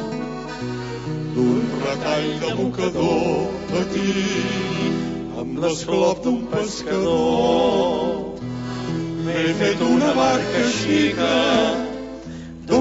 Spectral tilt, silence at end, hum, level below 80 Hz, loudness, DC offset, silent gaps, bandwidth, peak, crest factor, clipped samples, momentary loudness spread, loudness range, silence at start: -5 dB/octave; 0 s; none; -46 dBFS; -21 LUFS; under 0.1%; none; 8 kHz; -4 dBFS; 16 dB; under 0.1%; 11 LU; 3 LU; 0 s